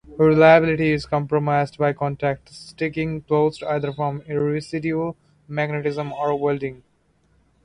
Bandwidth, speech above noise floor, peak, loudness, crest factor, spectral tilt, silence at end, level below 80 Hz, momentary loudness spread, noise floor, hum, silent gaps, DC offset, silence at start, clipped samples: 10.5 kHz; 42 dB; -2 dBFS; -21 LUFS; 20 dB; -7.5 dB/octave; 0.9 s; -52 dBFS; 13 LU; -62 dBFS; none; none; under 0.1%; 0.05 s; under 0.1%